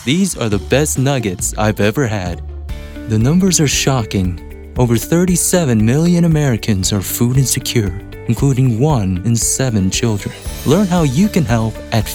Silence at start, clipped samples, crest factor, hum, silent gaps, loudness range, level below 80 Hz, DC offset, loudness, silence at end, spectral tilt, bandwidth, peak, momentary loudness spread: 0 s; under 0.1%; 14 dB; none; none; 2 LU; -30 dBFS; under 0.1%; -15 LUFS; 0 s; -5 dB/octave; 18.5 kHz; 0 dBFS; 10 LU